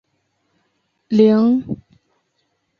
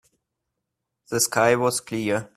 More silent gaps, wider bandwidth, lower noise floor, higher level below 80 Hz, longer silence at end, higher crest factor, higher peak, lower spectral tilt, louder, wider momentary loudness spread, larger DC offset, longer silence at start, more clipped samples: neither; second, 6.6 kHz vs 15.5 kHz; second, -69 dBFS vs -82 dBFS; about the same, -58 dBFS vs -62 dBFS; first, 1.05 s vs 0.1 s; about the same, 18 dB vs 22 dB; about the same, -2 dBFS vs -4 dBFS; first, -9 dB/octave vs -3.5 dB/octave; first, -15 LUFS vs -22 LUFS; first, 18 LU vs 7 LU; neither; about the same, 1.1 s vs 1.1 s; neither